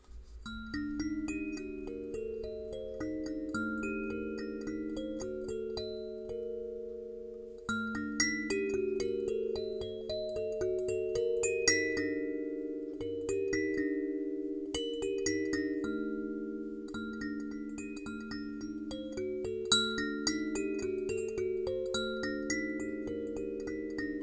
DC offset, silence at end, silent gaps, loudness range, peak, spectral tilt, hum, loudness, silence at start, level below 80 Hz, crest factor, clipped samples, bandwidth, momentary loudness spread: under 0.1%; 0 s; none; 6 LU; -12 dBFS; -3.5 dB/octave; none; -36 LUFS; 0.1 s; -56 dBFS; 22 dB; under 0.1%; 9.6 kHz; 10 LU